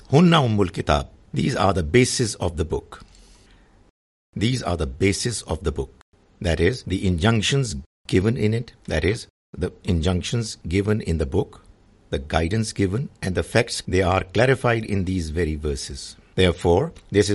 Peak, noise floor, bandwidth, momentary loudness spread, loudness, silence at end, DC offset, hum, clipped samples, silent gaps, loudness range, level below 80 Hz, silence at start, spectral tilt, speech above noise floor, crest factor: 0 dBFS; -53 dBFS; 11.5 kHz; 12 LU; -22 LUFS; 0 s; under 0.1%; none; under 0.1%; 3.90-4.33 s, 6.02-6.12 s, 7.86-8.04 s, 9.30-9.53 s; 4 LU; -38 dBFS; 0.1 s; -5.5 dB/octave; 31 dB; 22 dB